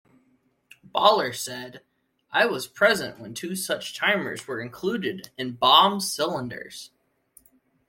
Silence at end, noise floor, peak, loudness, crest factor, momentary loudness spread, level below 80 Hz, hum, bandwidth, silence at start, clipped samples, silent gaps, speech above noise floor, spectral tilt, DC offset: 1 s; -66 dBFS; -2 dBFS; -23 LUFS; 24 dB; 18 LU; -68 dBFS; none; 16.5 kHz; 0.95 s; under 0.1%; none; 42 dB; -2.5 dB/octave; under 0.1%